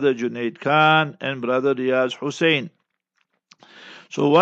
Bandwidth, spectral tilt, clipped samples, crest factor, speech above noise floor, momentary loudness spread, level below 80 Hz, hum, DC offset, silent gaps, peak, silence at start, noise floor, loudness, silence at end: 8.2 kHz; -5.5 dB/octave; under 0.1%; 18 dB; 52 dB; 10 LU; -76 dBFS; none; under 0.1%; none; -2 dBFS; 0 s; -72 dBFS; -20 LUFS; 0 s